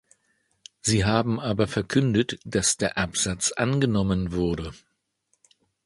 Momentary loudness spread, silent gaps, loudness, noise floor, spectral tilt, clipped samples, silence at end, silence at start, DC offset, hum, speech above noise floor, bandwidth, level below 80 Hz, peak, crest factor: 5 LU; none; -24 LUFS; -73 dBFS; -4.5 dB/octave; under 0.1%; 1.1 s; 0.85 s; under 0.1%; none; 48 dB; 11.5 kHz; -44 dBFS; -4 dBFS; 20 dB